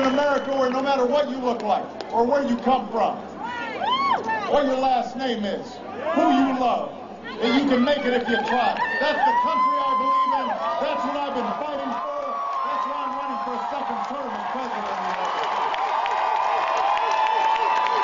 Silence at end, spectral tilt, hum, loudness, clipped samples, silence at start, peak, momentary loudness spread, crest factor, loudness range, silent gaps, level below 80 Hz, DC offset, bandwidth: 0 s; -4.5 dB/octave; none; -23 LUFS; under 0.1%; 0 s; -8 dBFS; 8 LU; 16 dB; 5 LU; none; -60 dBFS; under 0.1%; 7.6 kHz